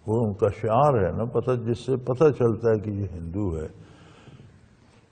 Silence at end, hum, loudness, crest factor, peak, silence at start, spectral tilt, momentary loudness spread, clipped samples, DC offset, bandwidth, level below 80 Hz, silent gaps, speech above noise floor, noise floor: 0.7 s; none; -24 LUFS; 18 dB; -8 dBFS; 0.05 s; -9 dB/octave; 11 LU; under 0.1%; under 0.1%; 9.4 kHz; -48 dBFS; none; 32 dB; -55 dBFS